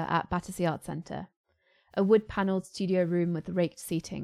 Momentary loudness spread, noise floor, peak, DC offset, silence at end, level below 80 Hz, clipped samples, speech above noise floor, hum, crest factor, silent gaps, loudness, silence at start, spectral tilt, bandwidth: 13 LU; -65 dBFS; -10 dBFS; under 0.1%; 0 s; -58 dBFS; under 0.1%; 36 dB; none; 20 dB; 1.36-1.44 s; -30 LUFS; 0 s; -6.5 dB/octave; 14 kHz